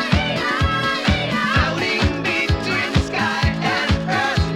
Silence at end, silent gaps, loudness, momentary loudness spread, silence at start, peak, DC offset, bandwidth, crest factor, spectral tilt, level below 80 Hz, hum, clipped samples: 0 s; none; -19 LUFS; 2 LU; 0 s; -4 dBFS; under 0.1%; 13.5 kHz; 16 dB; -5 dB/octave; -30 dBFS; none; under 0.1%